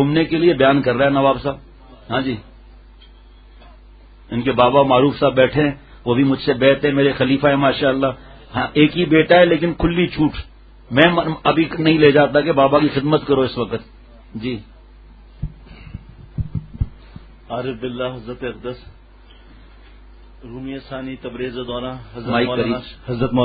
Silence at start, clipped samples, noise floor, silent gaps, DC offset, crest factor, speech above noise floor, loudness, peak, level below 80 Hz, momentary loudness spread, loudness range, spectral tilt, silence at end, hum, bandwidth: 0 s; under 0.1%; -44 dBFS; none; under 0.1%; 18 dB; 28 dB; -17 LUFS; 0 dBFS; -40 dBFS; 18 LU; 15 LU; -10 dB/octave; 0 s; none; 4.9 kHz